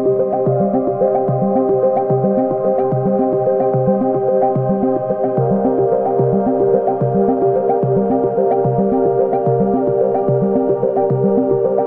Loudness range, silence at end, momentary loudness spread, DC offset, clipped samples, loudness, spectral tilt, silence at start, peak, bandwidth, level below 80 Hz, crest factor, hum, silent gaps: 1 LU; 0 s; 1 LU; under 0.1%; under 0.1%; -16 LUFS; -13.5 dB/octave; 0 s; -4 dBFS; 2.7 kHz; -48 dBFS; 12 dB; none; none